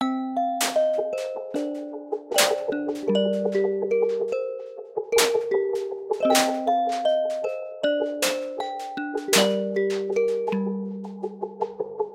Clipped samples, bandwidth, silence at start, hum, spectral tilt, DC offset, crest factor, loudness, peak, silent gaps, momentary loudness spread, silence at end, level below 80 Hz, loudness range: under 0.1%; 16.5 kHz; 0 s; none; -3 dB/octave; under 0.1%; 20 dB; -25 LUFS; -4 dBFS; none; 11 LU; 0 s; -72 dBFS; 2 LU